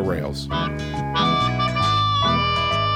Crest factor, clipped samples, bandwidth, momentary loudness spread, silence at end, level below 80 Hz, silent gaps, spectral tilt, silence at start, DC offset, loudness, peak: 14 dB; under 0.1%; 15.5 kHz; 7 LU; 0 s; -38 dBFS; none; -5.5 dB/octave; 0 s; under 0.1%; -20 LUFS; -8 dBFS